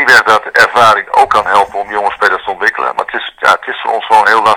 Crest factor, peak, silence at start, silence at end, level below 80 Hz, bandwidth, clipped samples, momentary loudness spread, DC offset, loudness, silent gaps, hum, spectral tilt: 10 dB; 0 dBFS; 0 s; 0 s; -48 dBFS; over 20 kHz; 3%; 9 LU; under 0.1%; -10 LUFS; none; none; -2 dB/octave